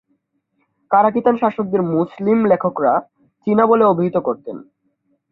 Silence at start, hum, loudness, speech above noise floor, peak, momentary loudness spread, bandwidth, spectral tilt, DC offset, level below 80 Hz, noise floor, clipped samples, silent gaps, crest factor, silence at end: 0.9 s; none; -17 LUFS; 52 dB; 0 dBFS; 11 LU; 4.2 kHz; -11 dB/octave; under 0.1%; -62 dBFS; -68 dBFS; under 0.1%; none; 16 dB; 0.75 s